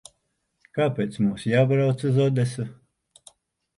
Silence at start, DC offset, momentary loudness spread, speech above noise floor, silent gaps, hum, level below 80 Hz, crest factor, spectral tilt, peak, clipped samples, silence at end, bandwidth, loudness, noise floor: 0.75 s; under 0.1%; 12 LU; 52 dB; none; none; -62 dBFS; 16 dB; -7.5 dB/octave; -8 dBFS; under 0.1%; 1.05 s; 11.5 kHz; -23 LUFS; -74 dBFS